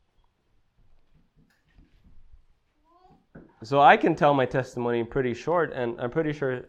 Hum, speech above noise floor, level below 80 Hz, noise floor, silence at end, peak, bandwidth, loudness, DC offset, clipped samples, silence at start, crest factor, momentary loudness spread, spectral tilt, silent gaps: none; 43 dB; -56 dBFS; -67 dBFS; 0.05 s; -2 dBFS; 8.8 kHz; -24 LUFS; under 0.1%; under 0.1%; 3.35 s; 24 dB; 11 LU; -6.5 dB/octave; none